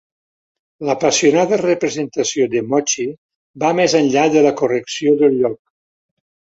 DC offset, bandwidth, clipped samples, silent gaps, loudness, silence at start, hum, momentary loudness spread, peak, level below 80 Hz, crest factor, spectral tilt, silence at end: under 0.1%; 8 kHz; under 0.1%; 3.18-3.29 s, 3.35-3.54 s; -16 LUFS; 0.8 s; none; 8 LU; -2 dBFS; -62 dBFS; 16 dB; -4 dB/octave; 1 s